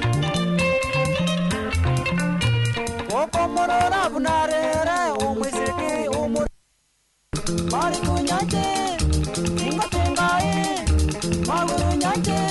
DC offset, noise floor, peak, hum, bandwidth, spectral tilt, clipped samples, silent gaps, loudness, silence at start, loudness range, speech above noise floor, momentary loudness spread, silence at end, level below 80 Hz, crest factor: under 0.1%; -66 dBFS; -6 dBFS; none; 12 kHz; -5 dB/octave; under 0.1%; none; -22 LUFS; 0 s; 3 LU; 45 dB; 4 LU; 0 s; -32 dBFS; 16 dB